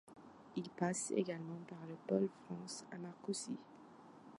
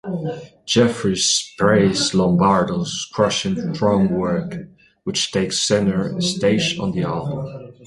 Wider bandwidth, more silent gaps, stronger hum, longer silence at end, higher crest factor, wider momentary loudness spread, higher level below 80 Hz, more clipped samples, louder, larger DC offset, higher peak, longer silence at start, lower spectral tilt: about the same, 11.5 kHz vs 11.5 kHz; neither; neither; about the same, 0 s vs 0 s; about the same, 22 dB vs 18 dB; first, 21 LU vs 11 LU; second, -84 dBFS vs -48 dBFS; neither; second, -43 LUFS vs -19 LUFS; neither; second, -22 dBFS vs -2 dBFS; about the same, 0.05 s vs 0.05 s; about the same, -5 dB/octave vs -4.5 dB/octave